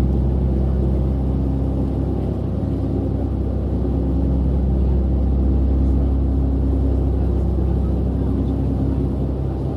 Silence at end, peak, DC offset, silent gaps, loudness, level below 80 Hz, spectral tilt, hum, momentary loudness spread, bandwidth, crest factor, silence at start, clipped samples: 0 s; -8 dBFS; under 0.1%; none; -20 LUFS; -20 dBFS; -11 dB/octave; none; 4 LU; 3.3 kHz; 12 dB; 0 s; under 0.1%